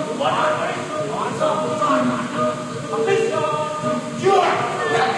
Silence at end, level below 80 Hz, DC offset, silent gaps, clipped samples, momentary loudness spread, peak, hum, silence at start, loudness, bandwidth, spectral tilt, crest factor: 0 s; -58 dBFS; under 0.1%; none; under 0.1%; 7 LU; -4 dBFS; none; 0 s; -20 LUFS; 12 kHz; -4.5 dB/octave; 16 dB